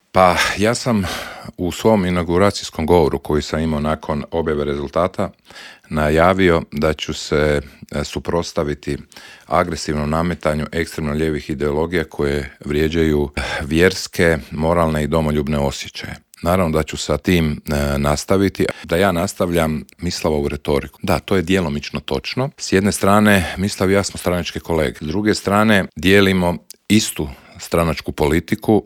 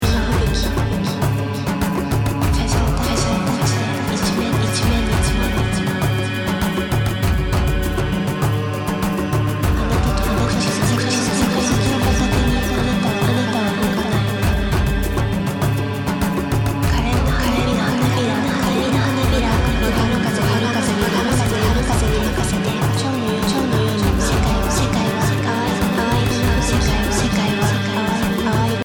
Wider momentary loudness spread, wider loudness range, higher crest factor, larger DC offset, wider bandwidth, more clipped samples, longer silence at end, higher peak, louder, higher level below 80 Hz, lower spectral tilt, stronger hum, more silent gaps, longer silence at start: first, 10 LU vs 3 LU; about the same, 4 LU vs 2 LU; about the same, 18 dB vs 14 dB; neither; about the same, 17.5 kHz vs 19 kHz; neither; about the same, 0.05 s vs 0 s; first, 0 dBFS vs -4 dBFS; about the same, -18 LUFS vs -18 LUFS; second, -36 dBFS vs -26 dBFS; about the same, -5.5 dB/octave vs -5.5 dB/octave; neither; neither; first, 0.15 s vs 0 s